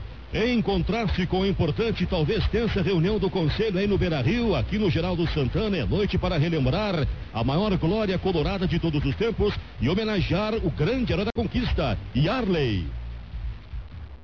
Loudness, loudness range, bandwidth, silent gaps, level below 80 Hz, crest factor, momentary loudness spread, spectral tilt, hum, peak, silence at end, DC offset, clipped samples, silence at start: -25 LUFS; 1 LU; 6.6 kHz; none; -34 dBFS; 12 dB; 5 LU; -8 dB/octave; none; -14 dBFS; 0 s; 0.4%; under 0.1%; 0 s